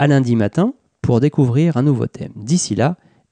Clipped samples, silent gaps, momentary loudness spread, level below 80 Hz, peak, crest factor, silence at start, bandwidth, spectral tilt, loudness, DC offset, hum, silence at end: under 0.1%; none; 10 LU; -50 dBFS; -4 dBFS; 12 dB; 0 s; 9.8 kHz; -6.5 dB/octave; -17 LUFS; under 0.1%; none; 0.35 s